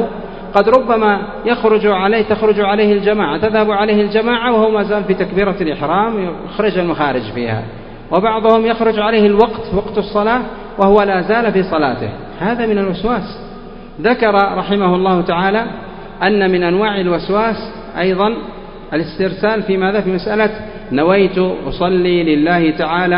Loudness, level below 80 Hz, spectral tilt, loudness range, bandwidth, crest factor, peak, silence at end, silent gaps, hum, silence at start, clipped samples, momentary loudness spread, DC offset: -14 LUFS; -38 dBFS; -9 dB/octave; 4 LU; 5.4 kHz; 14 dB; 0 dBFS; 0 s; none; none; 0 s; under 0.1%; 10 LU; under 0.1%